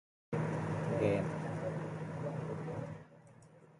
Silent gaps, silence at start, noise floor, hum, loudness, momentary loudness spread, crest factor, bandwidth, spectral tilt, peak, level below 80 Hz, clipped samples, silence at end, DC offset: none; 0.3 s; -60 dBFS; none; -38 LUFS; 11 LU; 18 dB; 11 kHz; -8 dB/octave; -20 dBFS; -66 dBFS; under 0.1%; 0.05 s; under 0.1%